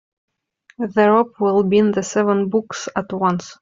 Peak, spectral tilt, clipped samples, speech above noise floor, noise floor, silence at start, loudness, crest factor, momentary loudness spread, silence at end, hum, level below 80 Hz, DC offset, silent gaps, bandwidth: -2 dBFS; -6 dB/octave; under 0.1%; 39 dB; -56 dBFS; 0.8 s; -18 LUFS; 16 dB; 10 LU; 0.1 s; none; -60 dBFS; under 0.1%; none; 7.8 kHz